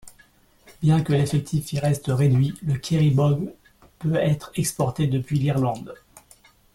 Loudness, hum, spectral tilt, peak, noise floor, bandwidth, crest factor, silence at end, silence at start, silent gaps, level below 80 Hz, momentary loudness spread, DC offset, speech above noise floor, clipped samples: -23 LUFS; none; -7 dB/octave; -8 dBFS; -56 dBFS; 14 kHz; 14 dB; 0.8 s; 0.05 s; none; -50 dBFS; 8 LU; under 0.1%; 35 dB; under 0.1%